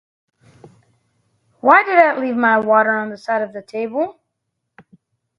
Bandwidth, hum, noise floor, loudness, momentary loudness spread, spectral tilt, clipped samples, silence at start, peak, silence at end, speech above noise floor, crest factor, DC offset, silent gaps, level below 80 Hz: 6.8 kHz; none; -76 dBFS; -16 LUFS; 13 LU; -6.5 dB/octave; under 0.1%; 1.65 s; 0 dBFS; 1.3 s; 60 dB; 18 dB; under 0.1%; none; -68 dBFS